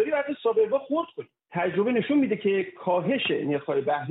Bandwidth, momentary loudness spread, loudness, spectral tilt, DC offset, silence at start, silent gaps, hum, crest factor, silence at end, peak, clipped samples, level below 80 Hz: 4.1 kHz; 6 LU; -26 LUFS; -4 dB/octave; under 0.1%; 0 s; none; none; 12 dB; 0 s; -14 dBFS; under 0.1%; -78 dBFS